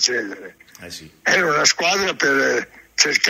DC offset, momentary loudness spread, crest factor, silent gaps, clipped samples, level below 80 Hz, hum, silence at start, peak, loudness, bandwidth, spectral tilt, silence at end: under 0.1%; 20 LU; 20 dB; none; under 0.1%; -60 dBFS; none; 0 s; 0 dBFS; -18 LUFS; 16 kHz; -1 dB/octave; 0 s